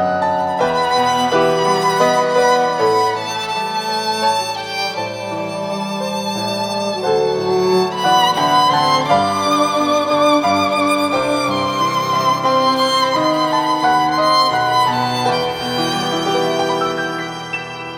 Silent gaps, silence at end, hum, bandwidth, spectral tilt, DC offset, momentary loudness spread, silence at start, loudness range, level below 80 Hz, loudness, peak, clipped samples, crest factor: none; 0 s; none; 20 kHz; -4 dB/octave; under 0.1%; 8 LU; 0 s; 5 LU; -54 dBFS; -16 LUFS; -2 dBFS; under 0.1%; 14 dB